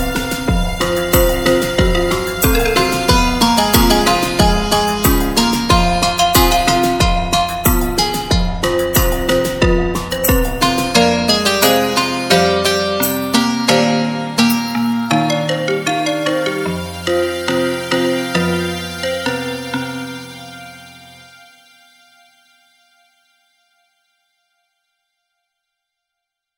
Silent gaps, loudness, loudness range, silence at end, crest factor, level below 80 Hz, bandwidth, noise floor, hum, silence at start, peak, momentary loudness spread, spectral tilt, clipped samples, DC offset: none; -15 LUFS; 7 LU; 5.45 s; 16 dB; -26 dBFS; 17.5 kHz; -80 dBFS; none; 0 s; 0 dBFS; 8 LU; -4 dB/octave; under 0.1%; under 0.1%